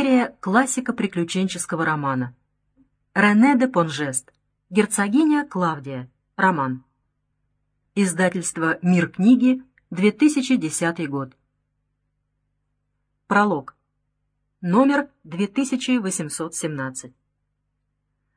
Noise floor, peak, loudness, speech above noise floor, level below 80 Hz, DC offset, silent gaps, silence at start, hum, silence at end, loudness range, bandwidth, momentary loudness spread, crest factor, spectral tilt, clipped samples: -74 dBFS; -4 dBFS; -21 LUFS; 54 dB; -66 dBFS; under 0.1%; none; 0 s; 50 Hz at -60 dBFS; 1.3 s; 6 LU; 10.5 kHz; 13 LU; 18 dB; -5 dB/octave; under 0.1%